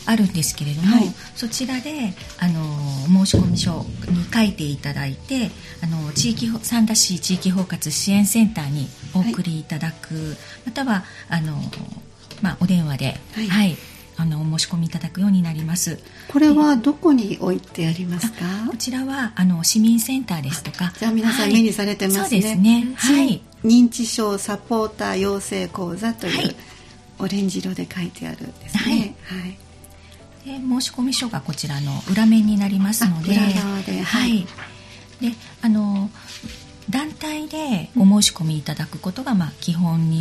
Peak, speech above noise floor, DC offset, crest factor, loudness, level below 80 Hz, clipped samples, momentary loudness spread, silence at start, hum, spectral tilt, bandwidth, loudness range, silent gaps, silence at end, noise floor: -2 dBFS; 24 dB; under 0.1%; 18 dB; -20 LUFS; -46 dBFS; under 0.1%; 13 LU; 0 s; none; -4.5 dB/octave; 15 kHz; 7 LU; none; 0 s; -44 dBFS